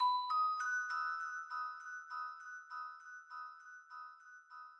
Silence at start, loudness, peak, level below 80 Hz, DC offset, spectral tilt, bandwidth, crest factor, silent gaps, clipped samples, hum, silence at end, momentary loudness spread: 0 s; -40 LUFS; -26 dBFS; under -90 dBFS; under 0.1%; 8 dB/octave; 10.5 kHz; 16 dB; none; under 0.1%; none; 0 s; 19 LU